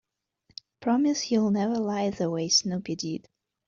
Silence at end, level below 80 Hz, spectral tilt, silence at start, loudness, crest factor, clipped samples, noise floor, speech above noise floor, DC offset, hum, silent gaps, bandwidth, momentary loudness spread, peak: 0.45 s; -66 dBFS; -4 dB/octave; 0.8 s; -26 LUFS; 18 dB; under 0.1%; -68 dBFS; 42 dB; under 0.1%; none; none; 7.6 kHz; 16 LU; -10 dBFS